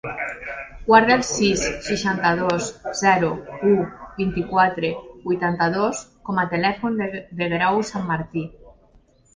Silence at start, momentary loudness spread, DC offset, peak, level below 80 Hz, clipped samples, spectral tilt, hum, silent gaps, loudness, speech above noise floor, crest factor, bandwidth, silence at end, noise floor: 0.05 s; 11 LU; under 0.1%; 0 dBFS; -48 dBFS; under 0.1%; -4.5 dB/octave; none; none; -21 LUFS; 34 dB; 20 dB; 10 kHz; 0.65 s; -55 dBFS